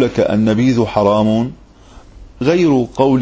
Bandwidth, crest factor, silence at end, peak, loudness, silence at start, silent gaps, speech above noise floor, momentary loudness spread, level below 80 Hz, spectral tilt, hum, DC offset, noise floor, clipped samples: 8 kHz; 14 dB; 0 s; 0 dBFS; -14 LUFS; 0 s; none; 27 dB; 5 LU; -40 dBFS; -7.5 dB/octave; none; under 0.1%; -41 dBFS; under 0.1%